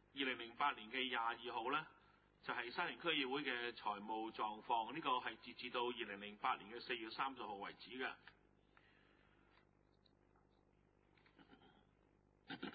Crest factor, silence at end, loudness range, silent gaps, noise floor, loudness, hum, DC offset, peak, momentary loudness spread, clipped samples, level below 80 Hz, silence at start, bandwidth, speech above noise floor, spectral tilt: 22 dB; 0 s; 11 LU; none; -75 dBFS; -44 LUFS; 50 Hz at -80 dBFS; under 0.1%; -26 dBFS; 9 LU; under 0.1%; -82 dBFS; 0.15 s; 4.8 kHz; 31 dB; -0.5 dB/octave